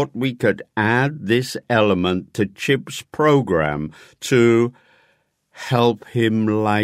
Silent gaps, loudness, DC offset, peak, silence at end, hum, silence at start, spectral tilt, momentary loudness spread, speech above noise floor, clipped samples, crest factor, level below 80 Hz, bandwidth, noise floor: none; -19 LUFS; under 0.1%; -2 dBFS; 0 s; none; 0 s; -6 dB/octave; 8 LU; 45 dB; under 0.1%; 18 dB; -52 dBFS; 15.5 kHz; -63 dBFS